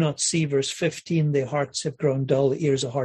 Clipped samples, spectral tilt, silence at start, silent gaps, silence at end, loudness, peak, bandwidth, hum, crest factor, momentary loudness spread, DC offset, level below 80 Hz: under 0.1%; -5 dB/octave; 0 s; none; 0 s; -24 LUFS; -8 dBFS; 12 kHz; none; 16 dB; 4 LU; under 0.1%; -62 dBFS